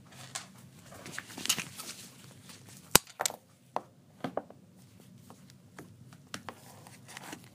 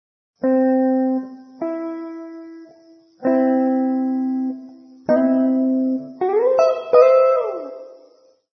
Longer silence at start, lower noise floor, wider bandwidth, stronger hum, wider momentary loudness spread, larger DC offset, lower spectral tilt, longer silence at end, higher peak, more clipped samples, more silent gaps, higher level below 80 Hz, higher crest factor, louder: second, 0 s vs 0.4 s; first, -57 dBFS vs -53 dBFS; first, 15.5 kHz vs 6.2 kHz; neither; first, 26 LU vs 20 LU; neither; second, -1.5 dB/octave vs -7 dB/octave; second, 0 s vs 0.65 s; about the same, 0 dBFS vs 0 dBFS; neither; neither; first, -64 dBFS vs -72 dBFS; first, 38 dB vs 18 dB; second, -34 LUFS vs -18 LUFS